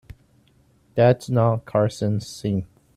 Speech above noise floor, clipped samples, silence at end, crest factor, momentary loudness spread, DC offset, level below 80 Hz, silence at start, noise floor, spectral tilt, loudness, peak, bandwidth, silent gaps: 38 dB; under 0.1%; 0.3 s; 18 dB; 9 LU; under 0.1%; -54 dBFS; 0.1 s; -59 dBFS; -7.5 dB/octave; -22 LUFS; -6 dBFS; 12.5 kHz; none